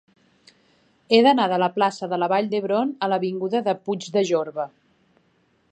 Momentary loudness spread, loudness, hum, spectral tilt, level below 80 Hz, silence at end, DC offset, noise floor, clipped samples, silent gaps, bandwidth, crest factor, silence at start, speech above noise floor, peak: 9 LU; -22 LUFS; none; -5.5 dB/octave; -76 dBFS; 1.05 s; under 0.1%; -64 dBFS; under 0.1%; none; 9 kHz; 20 dB; 1.1 s; 43 dB; -2 dBFS